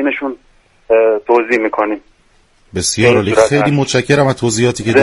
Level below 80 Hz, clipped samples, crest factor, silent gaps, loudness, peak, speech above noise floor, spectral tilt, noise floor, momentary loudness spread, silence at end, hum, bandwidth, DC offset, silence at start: -46 dBFS; under 0.1%; 14 dB; none; -13 LUFS; 0 dBFS; 39 dB; -5 dB/octave; -52 dBFS; 10 LU; 0 s; none; 11.5 kHz; under 0.1%; 0 s